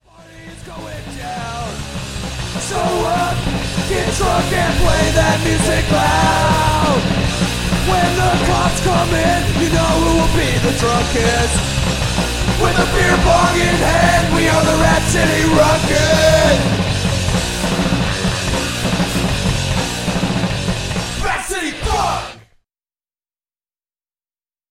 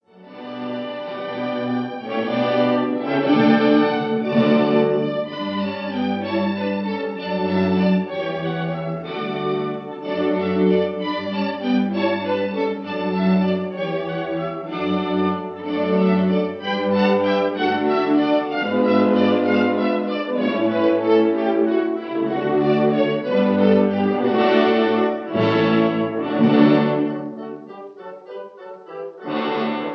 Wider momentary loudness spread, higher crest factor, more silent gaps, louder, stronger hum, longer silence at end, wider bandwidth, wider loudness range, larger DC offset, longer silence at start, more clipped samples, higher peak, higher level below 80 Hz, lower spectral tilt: about the same, 10 LU vs 11 LU; about the same, 14 dB vs 18 dB; neither; first, -15 LUFS vs -20 LUFS; neither; first, 2.3 s vs 0 s; first, 16.5 kHz vs 6.2 kHz; first, 8 LU vs 5 LU; neither; about the same, 0.2 s vs 0.2 s; neither; about the same, -2 dBFS vs -2 dBFS; first, -26 dBFS vs -66 dBFS; second, -4.5 dB/octave vs -8.5 dB/octave